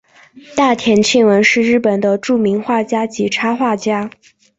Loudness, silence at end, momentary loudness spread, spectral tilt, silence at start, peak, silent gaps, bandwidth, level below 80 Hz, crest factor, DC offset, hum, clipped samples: -14 LUFS; 0.5 s; 8 LU; -4.5 dB/octave; 0.5 s; 0 dBFS; none; 8 kHz; -56 dBFS; 14 dB; under 0.1%; none; under 0.1%